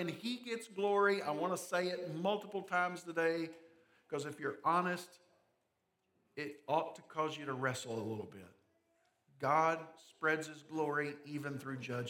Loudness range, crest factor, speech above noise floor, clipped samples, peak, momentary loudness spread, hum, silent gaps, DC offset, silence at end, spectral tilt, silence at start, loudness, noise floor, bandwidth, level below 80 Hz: 5 LU; 20 dB; 45 dB; under 0.1%; -18 dBFS; 13 LU; none; none; under 0.1%; 0 s; -5 dB/octave; 0 s; -38 LUFS; -83 dBFS; 17.5 kHz; -90 dBFS